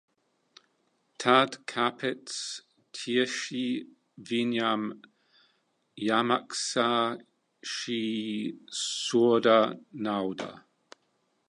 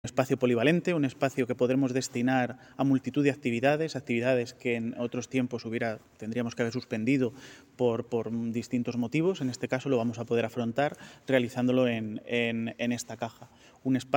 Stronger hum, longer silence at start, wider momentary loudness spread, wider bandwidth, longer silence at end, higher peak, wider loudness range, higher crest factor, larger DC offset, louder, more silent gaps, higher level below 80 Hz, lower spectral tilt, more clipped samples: neither; first, 1.2 s vs 0.05 s; first, 14 LU vs 8 LU; second, 11.5 kHz vs 17 kHz; first, 0.9 s vs 0 s; about the same, -6 dBFS vs -8 dBFS; about the same, 4 LU vs 4 LU; about the same, 24 dB vs 20 dB; neither; about the same, -28 LUFS vs -29 LUFS; neither; second, -78 dBFS vs -70 dBFS; second, -3.5 dB/octave vs -6 dB/octave; neither